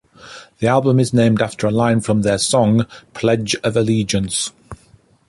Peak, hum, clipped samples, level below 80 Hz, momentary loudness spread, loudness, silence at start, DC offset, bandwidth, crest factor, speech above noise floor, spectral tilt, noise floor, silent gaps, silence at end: -2 dBFS; none; under 0.1%; -46 dBFS; 7 LU; -17 LUFS; 0.25 s; under 0.1%; 11.5 kHz; 14 dB; 36 dB; -5.5 dB/octave; -52 dBFS; none; 0.55 s